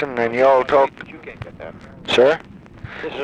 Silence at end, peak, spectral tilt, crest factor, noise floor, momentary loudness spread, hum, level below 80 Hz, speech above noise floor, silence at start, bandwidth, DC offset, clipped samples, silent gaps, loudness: 0 s; -4 dBFS; -5 dB/octave; 16 dB; -37 dBFS; 21 LU; none; -50 dBFS; 20 dB; 0 s; 10.5 kHz; under 0.1%; under 0.1%; none; -17 LUFS